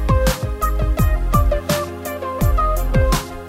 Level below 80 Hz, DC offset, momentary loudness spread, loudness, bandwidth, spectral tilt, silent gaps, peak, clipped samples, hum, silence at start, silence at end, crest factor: -20 dBFS; under 0.1%; 4 LU; -20 LUFS; 16.5 kHz; -5.5 dB/octave; none; -2 dBFS; under 0.1%; none; 0 s; 0 s; 14 dB